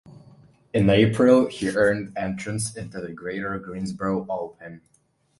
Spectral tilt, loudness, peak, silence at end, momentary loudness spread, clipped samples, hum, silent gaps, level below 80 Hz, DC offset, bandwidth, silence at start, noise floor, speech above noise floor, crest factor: -6 dB/octave; -23 LUFS; -4 dBFS; 0.6 s; 17 LU; under 0.1%; none; none; -50 dBFS; under 0.1%; 11.5 kHz; 0.05 s; -53 dBFS; 30 dB; 20 dB